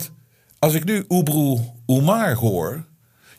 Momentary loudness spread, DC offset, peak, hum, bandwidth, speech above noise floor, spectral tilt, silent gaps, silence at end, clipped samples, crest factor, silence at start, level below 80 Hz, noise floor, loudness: 9 LU; under 0.1%; -2 dBFS; none; 15.5 kHz; 34 dB; -6 dB/octave; none; 0.55 s; under 0.1%; 18 dB; 0 s; -58 dBFS; -53 dBFS; -20 LUFS